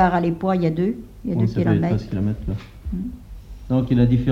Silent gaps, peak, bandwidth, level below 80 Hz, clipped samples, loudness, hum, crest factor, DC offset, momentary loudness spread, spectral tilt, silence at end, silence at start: none; -2 dBFS; 7 kHz; -36 dBFS; under 0.1%; -22 LUFS; none; 18 dB; under 0.1%; 14 LU; -9.5 dB/octave; 0 s; 0 s